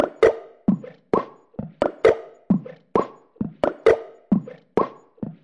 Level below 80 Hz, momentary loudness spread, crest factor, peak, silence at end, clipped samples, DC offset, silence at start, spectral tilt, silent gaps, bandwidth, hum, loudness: -54 dBFS; 16 LU; 18 dB; -4 dBFS; 0.1 s; under 0.1%; under 0.1%; 0 s; -8 dB/octave; none; 10 kHz; none; -23 LUFS